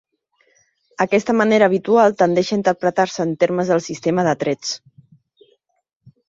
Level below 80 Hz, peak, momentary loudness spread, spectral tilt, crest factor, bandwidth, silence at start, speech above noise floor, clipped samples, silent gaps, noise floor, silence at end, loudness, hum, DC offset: -62 dBFS; -2 dBFS; 8 LU; -5.5 dB/octave; 18 dB; 7.8 kHz; 1 s; 46 dB; under 0.1%; none; -63 dBFS; 1.5 s; -18 LUFS; none; under 0.1%